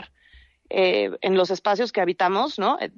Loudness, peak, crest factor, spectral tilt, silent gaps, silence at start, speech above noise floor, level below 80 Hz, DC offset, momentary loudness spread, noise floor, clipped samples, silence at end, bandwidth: -22 LUFS; -10 dBFS; 14 dB; -5 dB/octave; none; 0 s; 32 dB; -64 dBFS; under 0.1%; 3 LU; -54 dBFS; under 0.1%; 0.1 s; 7.4 kHz